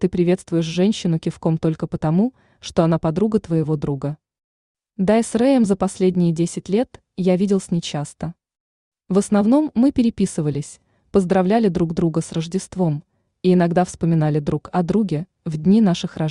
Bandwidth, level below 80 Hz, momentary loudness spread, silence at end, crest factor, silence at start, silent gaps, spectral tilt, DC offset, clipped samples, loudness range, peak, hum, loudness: 11 kHz; -48 dBFS; 10 LU; 0 s; 16 dB; 0 s; 4.44-4.75 s, 8.60-8.92 s; -7 dB/octave; under 0.1%; under 0.1%; 2 LU; -4 dBFS; none; -20 LUFS